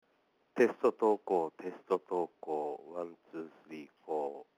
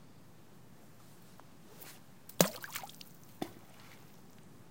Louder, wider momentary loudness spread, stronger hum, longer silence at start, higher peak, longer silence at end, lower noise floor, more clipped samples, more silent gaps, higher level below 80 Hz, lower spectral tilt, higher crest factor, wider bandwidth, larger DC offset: about the same, -34 LUFS vs -36 LUFS; second, 17 LU vs 27 LU; neither; first, 0.55 s vs 0 s; second, -14 dBFS vs -4 dBFS; about the same, 0.15 s vs 0.05 s; first, -74 dBFS vs -59 dBFS; neither; neither; second, -88 dBFS vs -76 dBFS; first, -6.5 dB/octave vs -3.5 dB/octave; second, 22 dB vs 40 dB; second, 11 kHz vs 17 kHz; second, under 0.1% vs 0.1%